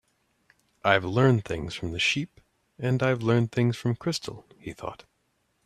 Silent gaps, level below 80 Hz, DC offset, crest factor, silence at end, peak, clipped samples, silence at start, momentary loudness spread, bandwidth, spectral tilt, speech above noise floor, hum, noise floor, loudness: none; -56 dBFS; under 0.1%; 24 dB; 0.7 s; -4 dBFS; under 0.1%; 0.85 s; 17 LU; 13 kHz; -6 dB/octave; 47 dB; none; -73 dBFS; -26 LUFS